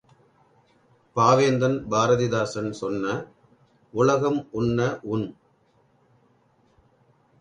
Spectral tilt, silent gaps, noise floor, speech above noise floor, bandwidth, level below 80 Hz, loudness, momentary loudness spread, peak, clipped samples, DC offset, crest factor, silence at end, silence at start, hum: -6 dB/octave; none; -63 dBFS; 40 dB; 10.5 kHz; -58 dBFS; -24 LUFS; 13 LU; -4 dBFS; under 0.1%; under 0.1%; 22 dB; 2.1 s; 1.15 s; none